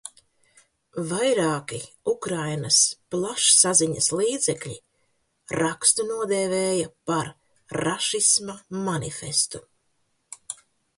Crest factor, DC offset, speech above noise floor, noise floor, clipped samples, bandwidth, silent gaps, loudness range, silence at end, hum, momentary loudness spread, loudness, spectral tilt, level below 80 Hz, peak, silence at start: 24 dB; under 0.1%; 47 dB; -71 dBFS; under 0.1%; 11.5 kHz; none; 5 LU; 0.45 s; none; 18 LU; -22 LUFS; -2.5 dB/octave; -62 dBFS; -2 dBFS; 0.05 s